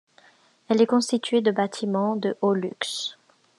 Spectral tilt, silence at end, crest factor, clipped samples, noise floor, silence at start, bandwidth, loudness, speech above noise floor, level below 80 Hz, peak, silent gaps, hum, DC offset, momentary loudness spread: -5 dB/octave; 0.45 s; 18 dB; under 0.1%; -58 dBFS; 0.7 s; 12 kHz; -24 LUFS; 35 dB; -84 dBFS; -6 dBFS; none; none; under 0.1%; 8 LU